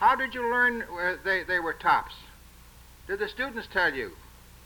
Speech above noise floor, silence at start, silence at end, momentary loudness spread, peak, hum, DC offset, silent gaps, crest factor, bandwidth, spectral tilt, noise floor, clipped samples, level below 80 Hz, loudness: 24 dB; 0 s; 0 s; 14 LU; -10 dBFS; 60 Hz at -55 dBFS; under 0.1%; none; 18 dB; over 20 kHz; -4 dB/octave; -51 dBFS; under 0.1%; -52 dBFS; -27 LUFS